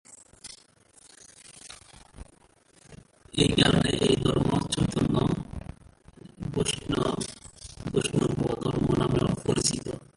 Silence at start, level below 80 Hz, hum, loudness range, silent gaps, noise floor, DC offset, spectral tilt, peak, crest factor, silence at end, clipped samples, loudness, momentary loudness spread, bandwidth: 0.1 s; -46 dBFS; none; 5 LU; none; -60 dBFS; under 0.1%; -5 dB/octave; -6 dBFS; 22 dB; 0.1 s; under 0.1%; -26 LUFS; 22 LU; 11.5 kHz